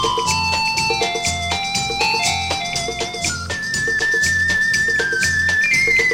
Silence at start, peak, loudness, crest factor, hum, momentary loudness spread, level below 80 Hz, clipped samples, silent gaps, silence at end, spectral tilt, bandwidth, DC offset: 0 s; -4 dBFS; -17 LUFS; 14 dB; none; 7 LU; -40 dBFS; under 0.1%; none; 0 s; -1.5 dB/octave; 17.5 kHz; under 0.1%